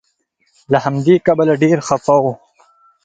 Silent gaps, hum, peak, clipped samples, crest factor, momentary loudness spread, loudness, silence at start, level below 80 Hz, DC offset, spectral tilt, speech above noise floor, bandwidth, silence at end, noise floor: none; none; 0 dBFS; under 0.1%; 16 dB; 6 LU; -14 LUFS; 0.7 s; -54 dBFS; under 0.1%; -7 dB/octave; 50 dB; 9.2 kHz; 0.7 s; -64 dBFS